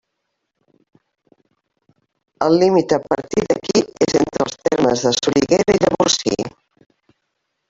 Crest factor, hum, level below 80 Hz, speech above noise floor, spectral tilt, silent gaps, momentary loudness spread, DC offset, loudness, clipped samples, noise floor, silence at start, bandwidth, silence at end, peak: 18 dB; none; -52 dBFS; 59 dB; -4 dB/octave; none; 6 LU; under 0.1%; -17 LUFS; under 0.1%; -75 dBFS; 2.4 s; 8 kHz; 1.2 s; 0 dBFS